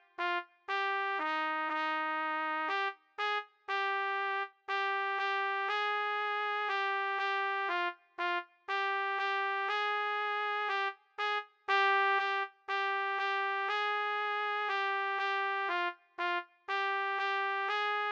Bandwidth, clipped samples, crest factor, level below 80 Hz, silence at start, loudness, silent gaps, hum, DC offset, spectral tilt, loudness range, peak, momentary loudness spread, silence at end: 8 kHz; under 0.1%; 16 dB; under -90 dBFS; 0.2 s; -33 LUFS; none; none; under 0.1%; 0 dB/octave; 2 LU; -18 dBFS; 5 LU; 0 s